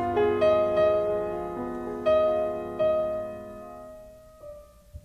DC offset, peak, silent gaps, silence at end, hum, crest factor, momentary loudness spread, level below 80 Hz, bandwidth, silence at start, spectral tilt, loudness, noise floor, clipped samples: under 0.1%; -12 dBFS; none; 0.05 s; none; 14 dB; 21 LU; -52 dBFS; 8.8 kHz; 0 s; -7 dB/octave; -26 LUFS; -48 dBFS; under 0.1%